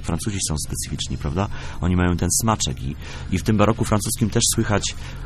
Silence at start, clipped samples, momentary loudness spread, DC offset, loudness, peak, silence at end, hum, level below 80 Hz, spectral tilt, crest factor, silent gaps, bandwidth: 0 s; under 0.1%; 8 LU; under 0.1%; -22 LUFS; -2 dBFS; 0 s; none; -34 dBFS; -4.5 dB/octave; 20 dB; none; 14.5 kHz